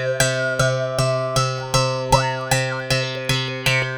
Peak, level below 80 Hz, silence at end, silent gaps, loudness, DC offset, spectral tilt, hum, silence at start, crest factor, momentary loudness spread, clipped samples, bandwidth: 0 dBFS; -40 dBFS; 0 s; none; -20 LUFS; under 0.1%; -3.5 dB/octave; none; 0 s; 20 dB; 3 LU; under 0.1%; over 20 kHz